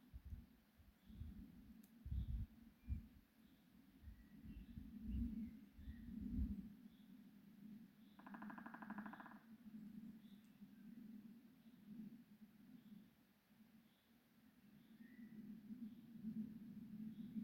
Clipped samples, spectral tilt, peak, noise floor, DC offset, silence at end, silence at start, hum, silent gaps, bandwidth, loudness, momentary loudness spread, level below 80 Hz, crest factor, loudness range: under 0.1%; -8 dB/octave; -34 dBFS; -75 dBFS; under 0.1%; 0 s; 0 s; none; none; 16.5 kHz; -56 LUFS; 16 LU; -60 dBFS; 20 dB; 12 LU